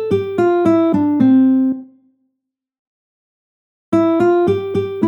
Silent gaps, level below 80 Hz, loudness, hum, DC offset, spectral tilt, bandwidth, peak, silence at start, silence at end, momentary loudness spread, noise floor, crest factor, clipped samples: 2.79-3.92 s; -58 dBFS; -15 LUFS; none; under 0.1%; -9 dB/octave; 7.2 kHz; -2 dBFS; 0 s; 0 s; 8 LU; -77 dBFS; 14 dB; under 0.1%